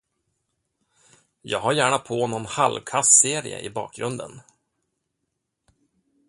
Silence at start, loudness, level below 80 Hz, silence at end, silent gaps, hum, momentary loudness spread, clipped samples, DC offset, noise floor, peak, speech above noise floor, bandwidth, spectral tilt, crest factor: 1.45 s; -21 LUFS; -64 dBFS; 1.9 s; none; none; 17 LU; under 0.1%; under 0.1%; -79 dBFS; 0 dBFS; 56 dB; 11.5 kHz; -2 dB/octave; 26 dB